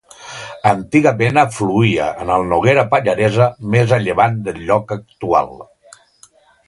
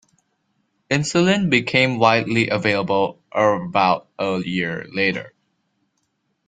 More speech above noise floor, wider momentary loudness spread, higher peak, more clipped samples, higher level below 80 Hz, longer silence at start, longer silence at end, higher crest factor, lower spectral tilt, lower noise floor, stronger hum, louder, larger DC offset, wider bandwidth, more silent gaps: second, 35 dB vs 52 dB; first, 11 LU vs 8 LU; about the same, 0 dBFS vs -2 dBFS; neither; first, -46 dBFS vs -58 dBFS; second, 0.2 s vs 0.9 s; second, 1.05 s vs 1.2 s; about the same, 16 dB vs 20 dB; first, -6.5 dB/octave vs -5 dB/octave; second, -50 dBFS vs -71 dBFS; neither; first, -15 LUFS vs -19 LUFS; neither; first, 11.5 kHz vs 9.4 kHz; neither